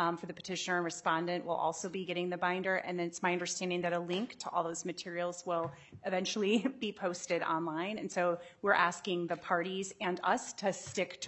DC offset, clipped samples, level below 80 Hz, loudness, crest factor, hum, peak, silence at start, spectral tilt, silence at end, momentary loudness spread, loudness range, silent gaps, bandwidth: under 0.1%; under 0.1%; -80 dBFS; -35 LUFS; 22 dB; none; -14 dBFS; 0 s; -4 dB/octave; 0 s; 7 LU; 2 LU; none; 8.6 kHz